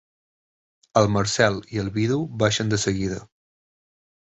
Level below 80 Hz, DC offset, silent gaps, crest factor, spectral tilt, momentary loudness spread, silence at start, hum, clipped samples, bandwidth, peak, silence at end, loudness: -48 dBFS; under 0.1%; none; 20 dB; -4.5 dB/octave; 8 LU; 0.95 s; none; under 0.1%; 8.2 kHz; -4 dBFS; 1 s; -23 LUFS